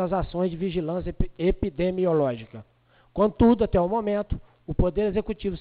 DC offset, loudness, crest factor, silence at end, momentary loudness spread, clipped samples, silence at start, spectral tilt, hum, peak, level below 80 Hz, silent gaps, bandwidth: under 0.1%; -25 LUFS; 18 dB; 0 s; 13 LU; under 0.1%; 0 s; -12 dB/octave; none; -8 dBFS; -36 dBFS; none; 4.8 kHz